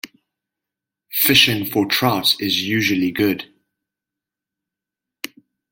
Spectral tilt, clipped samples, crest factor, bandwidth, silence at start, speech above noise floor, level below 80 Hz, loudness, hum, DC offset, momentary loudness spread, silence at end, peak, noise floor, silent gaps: -3.5 dB/octave; under 0.1%; 22 dB; 17 kHz; 0.05 s; 68 dB; -58 dBFS; -16 LUFS; none; under 0.1%; 21 LU; 2.25 s; 0 dBFS; -86 dBFS; none